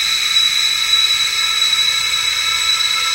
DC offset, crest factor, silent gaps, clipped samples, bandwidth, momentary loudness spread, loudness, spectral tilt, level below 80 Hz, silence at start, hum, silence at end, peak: under 0.1%; 12 dB; none; under 0.1%; 16 kHz; 3 LU; -13 LUFS; 3 dB/octave; -50 dBFS; 0 s; none; 0 s; -4 dBFS